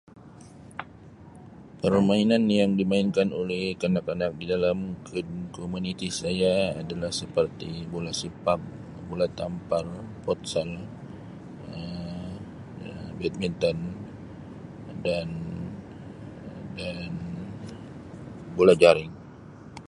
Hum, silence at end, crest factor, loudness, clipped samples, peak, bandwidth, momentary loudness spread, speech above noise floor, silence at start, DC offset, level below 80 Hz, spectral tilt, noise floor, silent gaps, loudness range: none; 0 s; 24 dB; -27 LUFS; under 0.1%; -2 dBFS; 11.5 kHz; 21 LU; 22 dB; 0.15 s; under 0.1%; -52 dBFS; -6 dB/octave; -48 dBFS; none; 10 LU